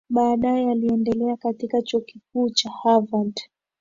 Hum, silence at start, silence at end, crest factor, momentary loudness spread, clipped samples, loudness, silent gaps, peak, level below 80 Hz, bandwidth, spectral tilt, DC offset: none; 0.1 s; 0.35 s; 18 dB; 8 LU; under 0.1%; -22 LUFS; none; -4 dBFS; -56 dBFS; 7.6 kHz; -5 dB/octave; under 0.1%